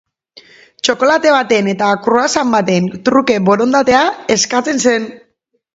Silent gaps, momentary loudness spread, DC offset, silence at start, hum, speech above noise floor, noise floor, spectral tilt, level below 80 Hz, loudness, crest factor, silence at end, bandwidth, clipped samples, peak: none; 4 LU; under 0.1%; 0.85 s; none; 50 dB; -63 dBFS; -4 dB/octave; -52 dBFS; -13 LUFS; 14 dB; 0.6 s; 8 kHz; under 0.1%; 0 dBFS